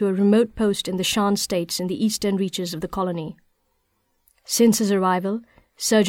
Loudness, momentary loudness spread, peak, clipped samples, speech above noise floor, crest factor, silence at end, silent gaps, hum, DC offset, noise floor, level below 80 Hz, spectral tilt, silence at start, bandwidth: -22 LUFS; 10 LU; -6 dBFS; under 0.1%; 48 dB; 16 dB; 0 s; none; none; under 0.1%; -69 dBFS; -54 dBFS; -4.5 dB/octave; 0 s; 17 kHz